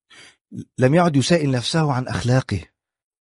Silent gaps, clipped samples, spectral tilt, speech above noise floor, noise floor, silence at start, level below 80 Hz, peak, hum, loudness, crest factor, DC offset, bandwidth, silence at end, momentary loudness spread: none; under 0.1%; -6 dB/octave; 30 dB; -49 dBFS; 0.5 s; -48 dBFS; -2 dBFS; none; -19 LUFS; 18 dB; under 0.1%; 11.5 kHz; 0.55 s; 17 LU